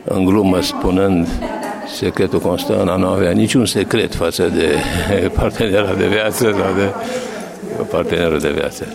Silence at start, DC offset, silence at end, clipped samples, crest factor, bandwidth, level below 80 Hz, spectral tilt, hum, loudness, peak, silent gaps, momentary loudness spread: 0 s; under 0.1%; 0 s; under 0.1%; 12 dB; 16.5 kHz; -34 dBFS; -5.5 dB/octave; none; -16 LUFS; -4 dBFS; none; 9 LU